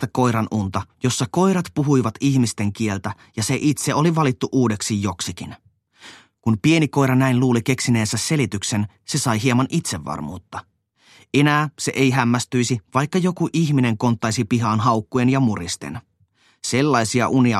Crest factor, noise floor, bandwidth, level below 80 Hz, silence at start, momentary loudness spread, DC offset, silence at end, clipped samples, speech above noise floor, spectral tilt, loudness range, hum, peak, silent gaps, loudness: 16 dB; -60 dBFS; 13 kHz; -54 dBFS; 0 s; 10 LU; under 0.1%; 0 s; under 0.1%; 40 dB; -5.5 dB/octave; 3 LU; none; -4 dBFS; none; -20 LUFS